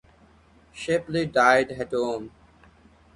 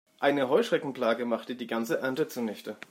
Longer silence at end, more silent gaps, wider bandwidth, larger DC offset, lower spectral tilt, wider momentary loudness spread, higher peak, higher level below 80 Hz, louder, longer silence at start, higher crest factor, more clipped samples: first, 0.9 s vs 0.15 s; neither; second, 11.5 kHz vs 16 kHz; neither; about the same, -5 dB/octave vs -5 dB/octave; first, 16 LU vs 9 LU; first, -4 dBFS vs -12 dBFS; first, -56 dBFS vs -82 dBFS; first, -23 LUFS vs -29 LUFS; first, 0.75 s vs 0.2 s; about the same, 22 dB vs 18 dB; neither